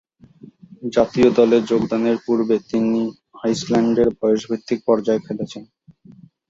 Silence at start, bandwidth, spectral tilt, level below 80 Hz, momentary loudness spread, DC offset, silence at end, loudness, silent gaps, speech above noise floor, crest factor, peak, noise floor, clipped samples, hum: 0.8 s; 7.8 kHz; -6.5 dB/octave; -54 dBFS; 12 LU; under 0.1%; 0.85 s; -19 LUFS; none; 29 dB; 18 dB; -2 dBFS; -47 dBFS; under 0.1%; none